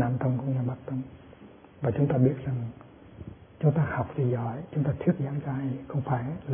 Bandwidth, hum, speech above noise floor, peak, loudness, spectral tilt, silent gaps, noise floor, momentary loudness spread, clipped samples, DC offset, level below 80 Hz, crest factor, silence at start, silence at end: 3.5 kHz; none; 23 dB; -10 dBFS; -29 LUFS; -13 dB/octave; none; -50 dBFS; 19 LU; under 0.1%; under 0.1%; -56 dBFS; 18 dB; 0 s; 0 s